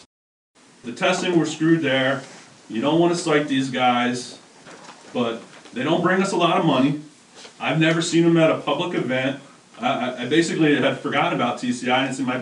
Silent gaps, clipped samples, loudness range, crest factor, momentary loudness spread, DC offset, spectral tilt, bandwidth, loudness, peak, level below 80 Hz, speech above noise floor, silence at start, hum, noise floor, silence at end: none; under 0.1%; 3 LU; 18 dB; 13 LU; under 0.1%; -5 dB/octave; 11 kHz; -21 LUFS; -4 dBFS; -72 dBFS; 23 dB; 0.85 s; none; -43 dBFS; 0 s